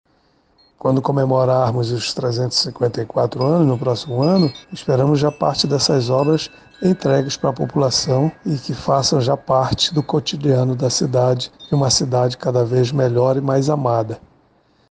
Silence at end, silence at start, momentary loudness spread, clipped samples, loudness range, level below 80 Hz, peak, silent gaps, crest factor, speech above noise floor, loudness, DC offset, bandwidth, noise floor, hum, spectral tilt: 0.75 s; 0.85 s; 6 LU; under 0.1%; 1 LU; -50 dBFS; -4 dBFS; none; 14 dB; 41 dB; -18 LUFS; under 0.1%; 9.6 kHz; -59 dBFS; none; -5.5 dB/octave